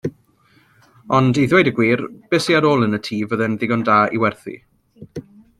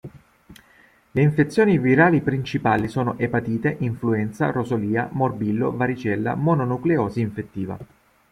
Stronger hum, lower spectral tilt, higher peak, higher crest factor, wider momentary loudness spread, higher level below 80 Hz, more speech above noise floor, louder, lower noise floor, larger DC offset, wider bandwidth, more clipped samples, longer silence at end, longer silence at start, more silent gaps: neither; second, -6.5 dB/octave vs -8.5 dB/octave; about the same, -2 dBFS vs -4 dBFS; about the same, 18 dB vs 18 dB; first, 21 LU vs 10 LU; about the same, -56 dBFS vs -54 dBFS; first, 39 dB vs 34 dB; first, -17 LUFS vs -22 LUFS; about the same, -56 dBFS vs -55 dBFS; neither; about the same, 12.5 kHz vs 12 kHz; neither; about the same, 0.4 s vs 0.45 s; about the same, 0.05 s vs 0.05 s; neither